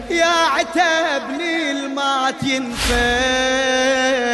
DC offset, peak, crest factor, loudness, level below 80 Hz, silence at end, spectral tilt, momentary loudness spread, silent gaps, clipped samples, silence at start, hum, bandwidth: under 0.1%; -6 dBFS; 12 dB; -17 LUFS; -36 dBFS; 0 s; -2.5 dB/octave; 5 LU; none; under 0.1%; 0 s; none; 12 kHz